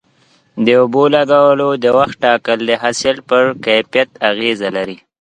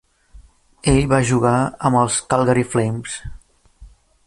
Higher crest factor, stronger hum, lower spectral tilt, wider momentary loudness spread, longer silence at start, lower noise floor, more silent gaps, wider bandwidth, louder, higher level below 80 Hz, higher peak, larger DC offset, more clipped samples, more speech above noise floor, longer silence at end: about the same, 14 dB vs 16 dB; neither; about the same, -4.5 dB/octave vs -5.5 dB/octave; second, 7 LU vs 12 LU; first, 0.55 s vs 0.35 s; first, -54 dBFS vs -46 dBFS; neither; second, 10 kHz vs 11.5 kHz; first, -13 LUFS vs -18 LUFS; second, -56 dBFS vs -38 dBFS; about the same, 0 dBFS vs -2 dBFS; neither; neither; first, 41 dB vs 29 dB; second, 0.25 s vs 0.4 s